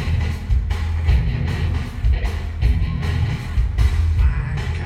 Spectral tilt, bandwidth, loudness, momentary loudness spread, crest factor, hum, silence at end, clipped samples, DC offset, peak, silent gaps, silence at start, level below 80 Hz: -7 dB/octave; 10 kHz; -21 LUFS; 4 LU; 14 dB; none; 0 s; under 0.1%; under 0.1%; -4 dBFS; none; 0 s; -20 dBFS